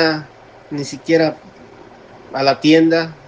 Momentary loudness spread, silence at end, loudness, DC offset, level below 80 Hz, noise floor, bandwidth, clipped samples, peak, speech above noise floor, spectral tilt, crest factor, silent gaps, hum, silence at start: 16 LU; 0.15 s; -16 LUFS; under 0.1%; -58 dBFS; -41 dBFS; 8 kHz; under 0.1%; 0 dBFS; 25 dB; -5.5 dB/octave; 18 dB; none; none; 0 s